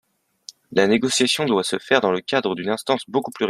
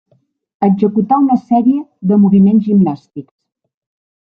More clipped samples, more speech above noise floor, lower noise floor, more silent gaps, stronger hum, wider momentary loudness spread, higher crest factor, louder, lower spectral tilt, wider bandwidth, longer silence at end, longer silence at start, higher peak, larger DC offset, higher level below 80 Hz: neither; second, 26 dB vs 47 dB; second, -46 dBFS vs -58 dBFS; neither; neither; second, 6 LU vs 10 LU; first, 20 dB vs 12 dB; second, -20 LUFS vs -12 LUFS; second, -3.5 dB/octave vs -12 dB/octave; first, 14.5 kHz vs 3.9 kHz; second, 0 s vs 1 s; about the same, 0.7 s vs 0.6 s; about the same, -2 dBFS vs 0 dBFS; neither; second, -64 dBFS vs -56 dBFS